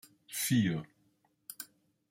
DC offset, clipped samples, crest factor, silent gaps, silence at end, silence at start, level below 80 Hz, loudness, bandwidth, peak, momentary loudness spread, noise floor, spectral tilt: under 0.1%; under 0.1%; 18 dB; none; 0.45 s; 0.3 s; -70 dBFS; -32 LUFS; 16 kHz; -18 dBFS; 20 LU; -73 dBFS; -4.5 dB/octave